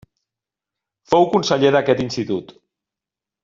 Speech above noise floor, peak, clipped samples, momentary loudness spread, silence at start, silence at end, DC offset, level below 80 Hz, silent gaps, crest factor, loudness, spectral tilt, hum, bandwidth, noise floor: 71 dB; -2 dBFS; under 0.1%; 9 LU; 1.1 s; 1 s; under 0.1%; -56 dBFS; none; 18 dB; -18 LUFS; -5.5 dB/octave; none; 7.6 kHz; -88 dBFS